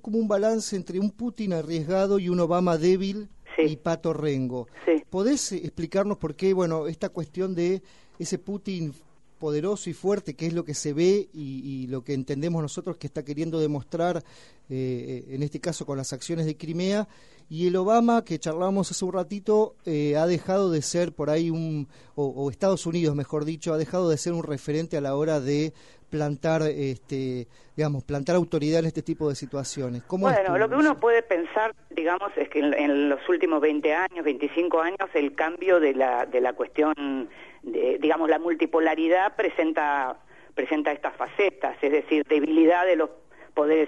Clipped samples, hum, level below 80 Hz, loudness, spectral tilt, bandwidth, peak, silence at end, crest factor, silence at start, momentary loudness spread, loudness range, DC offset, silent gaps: under 0.1%; none; -58 dBFS; -26 LUFS; -6 dB/octave; 11.5 kHz; -8 dBFS; 0 s; 18 dB; 0.05 s; 10 LU; 6 LU; 0.2%; none